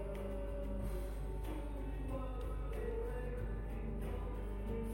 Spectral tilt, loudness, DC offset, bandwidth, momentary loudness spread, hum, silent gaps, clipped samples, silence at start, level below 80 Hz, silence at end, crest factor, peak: -8 dB/octave; -44 LUFS; under 0.1%; 16 kHz; 2 LU; none; none; under 0.1%; 0 s; -42 dBFS; 0 s; 10 dB; -30 dBFS